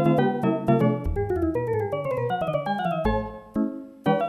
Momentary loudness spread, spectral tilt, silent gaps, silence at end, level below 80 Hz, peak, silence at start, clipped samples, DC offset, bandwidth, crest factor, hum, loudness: 7 LU; -9 dB/octave; none; 0 s; -38 dBFS; -8 dBFS; 0 s; under 0.1%; under 0.1%; 14 kHz; 16 dB; none; -25 LUFS